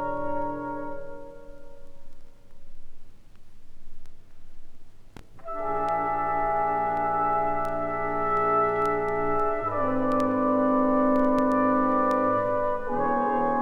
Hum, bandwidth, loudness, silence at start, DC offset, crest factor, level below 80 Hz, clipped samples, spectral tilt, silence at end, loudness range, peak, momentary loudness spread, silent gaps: none; 7.8 kHz; -25 LUFS; 0 s; under 0.1%; 14 dB; -44 dBFS; under 0.1%; -8 dB/octave; 0 s; 14 LU; -12 dBFS; 11 LU; none